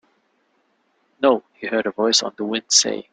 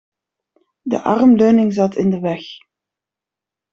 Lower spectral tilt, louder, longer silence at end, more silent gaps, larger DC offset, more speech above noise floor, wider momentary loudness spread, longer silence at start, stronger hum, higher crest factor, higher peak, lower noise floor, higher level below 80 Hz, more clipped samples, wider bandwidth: second, -1 dB/octave vs -8 dB/octave; second, -19 LUFS vs -15 LUFS; second, 0.1 s vs 1.15 s; neither; neither; second, 46 dB vs 72 dB; second, 9 LU vs 17 LU; first, 1.2 s vs 0.85 s; second, none vs 50 Hz at -40 dBFS; first, 22 dB vs 14 dB; about the same, 0 dBFS vs -2 dBFS; second, -66 dBFS vs -86 dBFS; second, -68 dBFS vs -56 dBFS; neither; first, 11 kHz vs 7.2 kHz